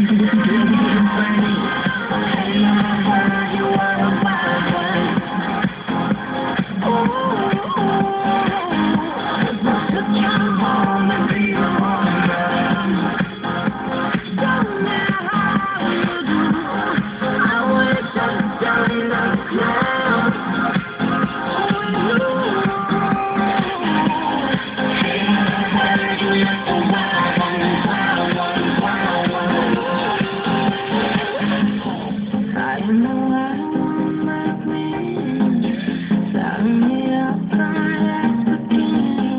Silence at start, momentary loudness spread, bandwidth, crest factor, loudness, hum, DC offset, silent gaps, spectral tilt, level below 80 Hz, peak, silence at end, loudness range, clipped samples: 0 s; 5 LU; 4 kHz; 14 dB; -18 LUFS; none; under 0.1%; none; -10 dB/octave; -48 dBFS; -4 dBFS; 0 s; 3 LU; under 0.1%